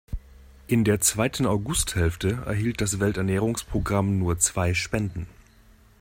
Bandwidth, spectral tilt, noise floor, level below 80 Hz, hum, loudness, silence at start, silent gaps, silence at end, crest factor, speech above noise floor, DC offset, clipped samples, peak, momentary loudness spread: 16.5 kHz; -4.5 dB/octave; -54 dBFS; -40 dBFS; none; -24 LUFS; 0.1 s; none; 0.7 s; 18 dB; 30 dB; under 0.1%; under 0.1%; -6 dBFS; 7 LU